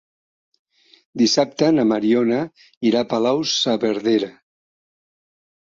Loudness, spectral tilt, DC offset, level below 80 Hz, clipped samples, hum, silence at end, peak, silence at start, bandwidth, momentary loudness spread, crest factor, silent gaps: -19 LUFS; -4.5 dB/octave; under 0.1%; -66 dBFS; under 0.1%; none; 1.45 s; -4 dBFS; 1.15 s; 7.6 kHz; 7 LU; 16 dB; 2.77-2.81 s